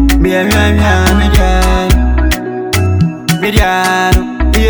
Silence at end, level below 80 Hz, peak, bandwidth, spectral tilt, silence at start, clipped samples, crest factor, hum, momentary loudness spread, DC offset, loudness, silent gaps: 0 s; -14 dBFS; 0 dBFS; over 20 kHz; -5.5 dB/octave; 0 s; under 0.1%; 10 dB; none; 4 LU; under 0.1%; -11 LUFS; none